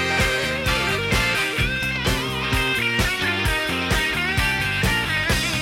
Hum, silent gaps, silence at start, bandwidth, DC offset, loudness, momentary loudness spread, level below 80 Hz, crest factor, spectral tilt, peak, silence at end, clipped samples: none; none; 0 s; 16.5 kHz; under 0.1%; -20 LUFS; 2 LU; -32 dBFS; 14 dB; -3.5 dB/octave; -8 dBFS; 0 s; under 0.1%